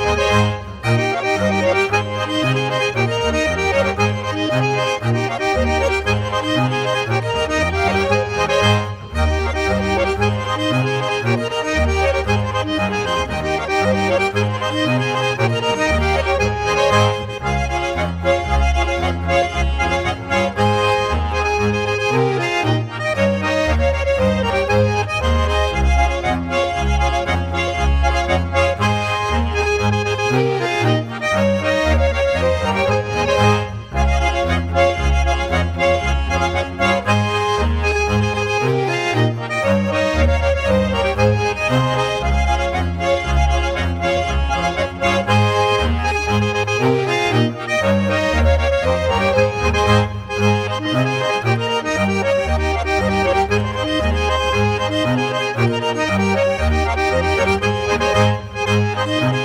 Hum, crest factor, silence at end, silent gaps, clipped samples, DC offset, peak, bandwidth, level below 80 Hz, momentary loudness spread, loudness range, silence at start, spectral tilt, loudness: none; 16 dB; 0 s; none; under 0.1%; under 0.1%; -2 dBFS; 12.5 kHz; -26 dBFS; 4 LU; 1 LU; 0 s; -5.5 dB/octave; -18 LUFS